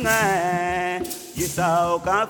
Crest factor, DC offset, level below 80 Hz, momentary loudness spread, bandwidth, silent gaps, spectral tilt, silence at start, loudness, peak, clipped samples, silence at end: 14 dB; under 0.1%; -46 dBFS; 8 LU; over 20 kHz; none; -4 dB/octave; 0 s; -22 LUFS; -8 dBFS; under 0.1%; 0 s